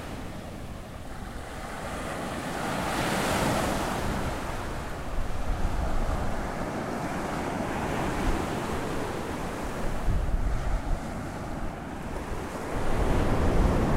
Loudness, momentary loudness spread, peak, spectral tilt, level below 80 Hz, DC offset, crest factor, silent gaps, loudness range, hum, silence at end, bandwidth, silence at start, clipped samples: -31 LUFS; 11 LU; -12 dBFS; -5.5 dB/octave; -32 dBFS; under 0.1%; 16 dB; none; 4 LU; none; 0 s; 16 kHz; 0 s; under 0.1%